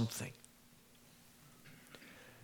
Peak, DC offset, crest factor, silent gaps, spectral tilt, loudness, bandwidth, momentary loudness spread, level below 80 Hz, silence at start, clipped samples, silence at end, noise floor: -26 dBFS; under 0.1%; 22 dB; none; -4.5 dB/octave; -50 LUFS; over 20 kHz; 18 LU; -76 dBFS; 0 s; under 0.1%; 0 s; -65 dBFS